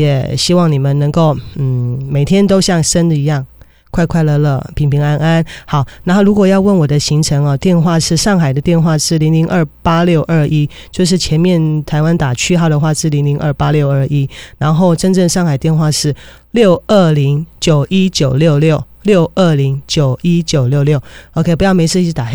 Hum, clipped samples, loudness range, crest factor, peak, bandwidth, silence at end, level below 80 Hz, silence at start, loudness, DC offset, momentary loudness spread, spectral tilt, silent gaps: none; under 0.1%; 2 LU; 12 dB; 0 dBFS; over 20 kHz; 0 s; -34 dBFS; 0 s; -12 LUFS; 1%; 6 LU; -6 dB/octave; none